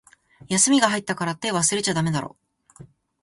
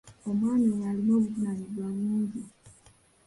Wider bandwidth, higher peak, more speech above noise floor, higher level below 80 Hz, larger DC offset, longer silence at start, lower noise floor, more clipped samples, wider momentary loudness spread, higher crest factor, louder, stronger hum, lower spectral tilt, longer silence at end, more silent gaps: about the same, 11.5 kHz vs 11.5 kHz; first, -4 dBFS vs -16 dBFS; second, 27 dB vs 33 dB; about the same, -60 dBFS vs -64 dBFS; neither; first, 0.5 s vs 0.05 s; second, -49 dBFS vs -60 dBFS; neither; about the same, 10 LU vs 9 LU; first, 20 dB vs 12 dB; first, -21 LUFS vs -28 LUFS; neither; second, -3 dB/octave vs -8.5 dB/octave; second, 0.4 s vs 0.55 s; neither